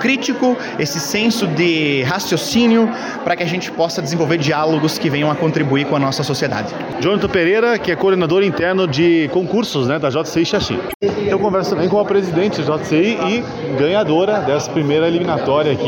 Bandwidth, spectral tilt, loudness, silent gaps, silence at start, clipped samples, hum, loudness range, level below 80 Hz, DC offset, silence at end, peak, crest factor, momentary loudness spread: 17 kHz; -5.5 dB/octave; -16 LUFS; 10.94-11.00 s; 0 s; under 0.1%; none; 1 LU; -48 dBFS; under 0.1%; 0 s; -4 dBFS; 12 dB; 5 LU